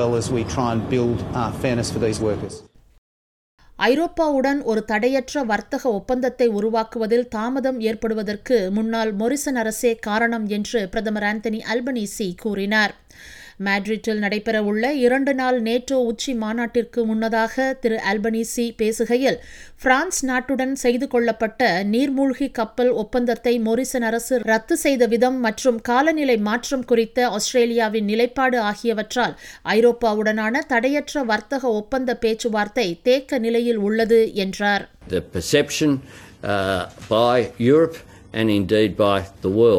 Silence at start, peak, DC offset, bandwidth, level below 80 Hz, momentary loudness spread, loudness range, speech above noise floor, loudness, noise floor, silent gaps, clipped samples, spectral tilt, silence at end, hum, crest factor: 0 s; -2 dBFS; under 0.1%; 18 kHz; -48 dBFS; 6 LU; 3 LU; over 70 dB; -21 LUFS; under -90 dBFS; 2.98-3.58 s; under 0.1%; -4.5 dB/octave; 0 s; none; 18 dB